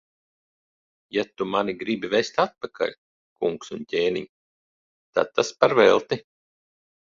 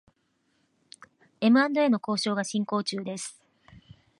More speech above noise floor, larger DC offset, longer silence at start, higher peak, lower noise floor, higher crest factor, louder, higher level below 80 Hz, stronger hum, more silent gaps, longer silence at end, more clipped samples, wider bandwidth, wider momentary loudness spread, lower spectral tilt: first, over 67 dB vs 47 dB; neither; second, 1.15 s vs 1.4 s; first, -2 dBFS vs -10 dBFS; first, under -90 dBFS vs -72 dBFS; first, 24 dB vs 18 dB; about the same, -24 LUFS vs -26 LUFS; first, -66 dBFS vs -72 dBFS; neither; first, 2.98-3.36 s, 4.29-5.13 s vs none; about the same, 0.9 s vs 0.9 s; neither; second, 7.6 kHz vs 11.5 kHz; about the same, 12 LU vs 14 LU; about the same, -4.5 dB/octave vs -4.5 dB/octave